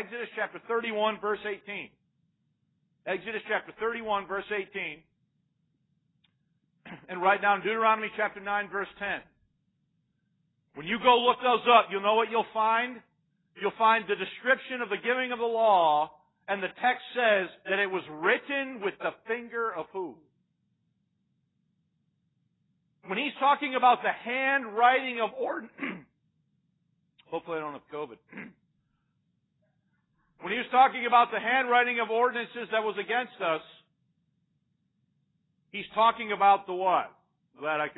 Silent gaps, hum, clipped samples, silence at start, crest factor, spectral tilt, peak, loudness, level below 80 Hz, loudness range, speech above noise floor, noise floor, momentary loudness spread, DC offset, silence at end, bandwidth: none; none; under 0.1%; 0 s; 22 dB; -7.5 dB/octave; -8 dBFS; -27 LUFS; -74 dBFS; 13 LU; 48 dB; -76 dBFS; 15 LU; under 0.1%; 0.05 s; 4.1 kHz